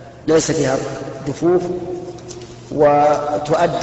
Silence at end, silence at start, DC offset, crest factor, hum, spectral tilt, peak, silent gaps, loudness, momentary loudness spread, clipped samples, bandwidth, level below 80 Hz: 0 s; 0 s; under 0.1%; 16 dB; none; -5.5 dB/octave; -2 dBFS; none; -17 LUFS; 17 LU; under 0.1%; 8.4 kHz; -46 dBFS